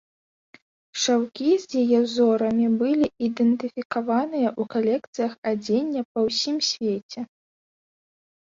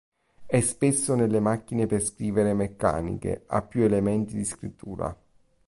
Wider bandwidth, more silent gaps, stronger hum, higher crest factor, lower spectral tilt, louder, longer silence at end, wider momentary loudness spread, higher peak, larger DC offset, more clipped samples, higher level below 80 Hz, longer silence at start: second, 7.6 kHz vs 11.5 kHz; first, 3.85-3.90 s, 5.07-5.13 s, 5.38-5.42 s, 6.05-6.15 s, 7.03-7.09 s vs none; neither; about the same, 14 dB vs 18 dB; second, -4 dB/octave vs -6 dB/octave; first, -23 LUFS vs -26 LUFS; first, 1.25 s vs 0.55 s; second, 8 LU vs 11 LU; about the same, -10 dBFS vs -8 dBFS; neither; neither; second, -68 dBFS vs -48 dBFS; first, 0.95 s vs 0.4 s